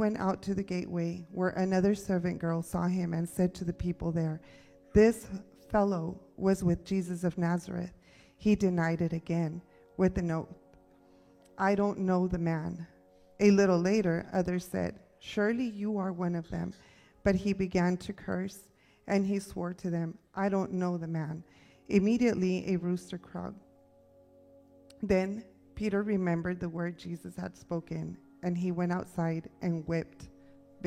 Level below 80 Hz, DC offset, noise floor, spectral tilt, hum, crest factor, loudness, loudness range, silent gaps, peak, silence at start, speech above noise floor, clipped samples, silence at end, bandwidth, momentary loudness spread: -54 dBFS; under 0.1%; -61 dBFS; -7.5 dB/octave; none; 20 dB; -32 LUFS; 6 LU; none; -12 dBFS; 0 s; 31 dB; under 0.1%; 0 s; 14.5 kHz; 14 LU